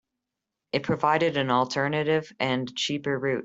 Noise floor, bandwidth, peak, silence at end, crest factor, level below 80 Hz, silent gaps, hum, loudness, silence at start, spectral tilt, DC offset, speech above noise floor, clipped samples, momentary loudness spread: -86 dBFS; 8 kHz; -8 dBFS; 0 s; 18 dB; -64 dBFS; none; none; -26 LUFS; 0.75 s; -5 dB/octave; under 0.1%; 60 dB; under 0.1%; 5 LU